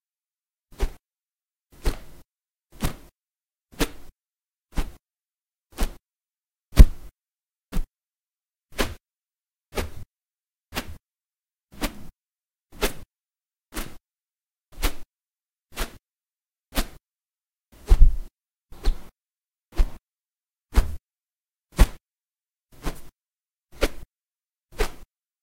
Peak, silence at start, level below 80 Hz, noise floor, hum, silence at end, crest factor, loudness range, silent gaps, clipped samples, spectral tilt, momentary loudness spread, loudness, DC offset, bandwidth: 0 dBFS; 0.8 s; -26 dBFS; under -90 dBFS; none; 0.4 s; 26 dB; 11 LU; none; under 0.1%; -5 dB/octave; 23 LU; -28 LUFS; under 0.1%; 16 kHz